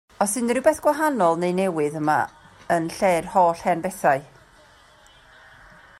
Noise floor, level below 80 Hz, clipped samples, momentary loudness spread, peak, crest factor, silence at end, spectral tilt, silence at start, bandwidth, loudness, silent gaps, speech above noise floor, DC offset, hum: -52 dBFS; -58 dBFS; under 0.1%; 5 LU; -6 dBFS; 18 dB; 1.75 s; -5 dB/octave; 0.2 s; 16 kHz; -22 LUFS; none; 31 dB; under 0.1%; none